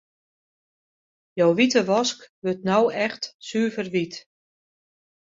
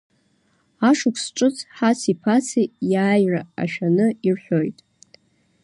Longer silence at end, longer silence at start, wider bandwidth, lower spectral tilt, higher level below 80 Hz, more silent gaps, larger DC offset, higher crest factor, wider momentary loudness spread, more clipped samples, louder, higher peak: first, 1.05 s vs 0.9 s; first, 1.35 s vs 0.8 s; second, 7.8 kHz vs 11.5 kHz; about the same, -4.5 dB/octave vs -5.5 dB/octave; about the same, -68 dBFS vs -68 dBFS; first, 2.29-2.42 s, 3.34-3.39 s vs none; neither; first, 20 dB vs 14 dB; first, 14 LU vs 5 LU; neither; about the same, -23 LUFS vs -21 LUFS; about the same, -6 dBFS vs -6 dBFS